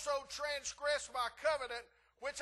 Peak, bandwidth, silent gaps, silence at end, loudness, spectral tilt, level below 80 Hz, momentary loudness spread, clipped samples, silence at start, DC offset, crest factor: -22 dBFS; 12.5 kHz; none; 0 s; -39 LUFS; 0 dB/octave; -68 dBFS; 8 LU; under 0.1%; 0 s; under 0.1%; 18 dB